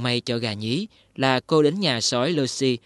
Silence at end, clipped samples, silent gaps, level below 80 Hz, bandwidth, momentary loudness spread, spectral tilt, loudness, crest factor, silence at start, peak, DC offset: 0.1 s; under 0.1%; none; -64 dBFS; 11.5 kHz; 8 LU; -4.5 dB/octave; -22 LUFS; 20 dB; 0 s; -4 dBFS; under 0.1%